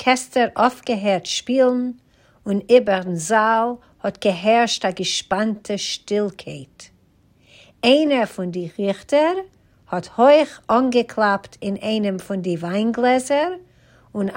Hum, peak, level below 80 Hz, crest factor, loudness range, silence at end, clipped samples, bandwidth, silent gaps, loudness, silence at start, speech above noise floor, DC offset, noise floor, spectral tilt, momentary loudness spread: none; -2 dBFS; -60 dBFS; 18 dB; 4 LU; 0 s; under 0.1%; 16 kHz; none; -20 LUFS; 0 s; 38 dB; under 0.1%; -57 dBFS; -4.5 dB/octave; 12 LU